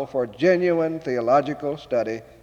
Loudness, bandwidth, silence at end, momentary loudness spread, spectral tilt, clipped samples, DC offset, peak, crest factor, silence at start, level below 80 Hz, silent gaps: -22 LUFS; 7.8 kHz; 0.2 s; 8 LU; -7 dB/octave; under 0.1%; under 0.1%; -8 dBFS; 16 dB; 0 s; -60 dBFS; none